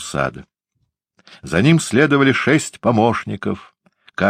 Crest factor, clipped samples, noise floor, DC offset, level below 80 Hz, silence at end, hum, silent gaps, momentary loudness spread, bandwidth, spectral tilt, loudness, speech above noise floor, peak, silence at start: 18 dB; under 0.1%; -71 dBFS; under 0.1%; -50 dBFS; 0 s; none; none; 12 LU; 15 kHz; -5.5 dB/octave; -17 LUFS; 54 dB; 0 dBFS; 0 s